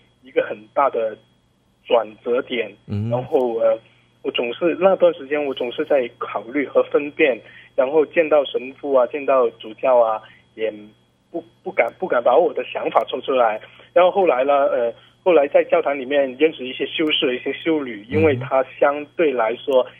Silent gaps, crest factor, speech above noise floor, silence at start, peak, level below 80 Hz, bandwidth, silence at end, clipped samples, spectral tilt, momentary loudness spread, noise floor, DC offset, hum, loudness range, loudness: none; 20 dB; 41 dB; 0.35 s; 0 dBFS; -66 dBFS; 3.8 kHz; 0.1 s; under 0.1%; -7.5 dB/octave; 10 LU; -61 dBFS; under 0.1%; none; 4 LU; -20 LUFS